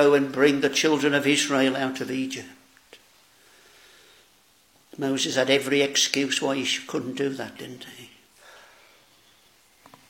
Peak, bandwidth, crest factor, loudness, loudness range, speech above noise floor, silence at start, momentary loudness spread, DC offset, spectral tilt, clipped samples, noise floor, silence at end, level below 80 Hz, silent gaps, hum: -4 dBFS; 17 kHz; 22 dB; -23 LUFS; 11 LU; 36 dB; 0 s; 17 LU; under 0.1%; -3 dB/octave; under 0.1%; -60 dBFS; 2.05 s; -74 dBFS; none; none